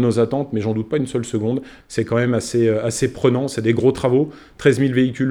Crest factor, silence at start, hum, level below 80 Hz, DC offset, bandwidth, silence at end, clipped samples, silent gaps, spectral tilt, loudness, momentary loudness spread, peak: 18 dB; 0 s; none; -50 dBFS; under 0.1%; 13.5 kHz; 0 s; under 0.1%; none; -6.5 dB/octave; -19 LUFS; 6 LU; 0 dBFS